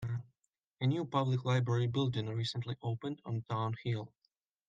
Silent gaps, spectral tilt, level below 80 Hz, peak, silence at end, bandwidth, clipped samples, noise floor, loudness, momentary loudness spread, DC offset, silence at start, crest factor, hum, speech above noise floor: 0.67-0.71 s; -7 dB/octave; -70 dBFS; -18 dBFS; 0.6 s; 7.8 kHz; under 0.1%; -82 dBFS; -36 LUFS; 9 LU; under 0.1%; 0 s; 18 dB; none; 48 dB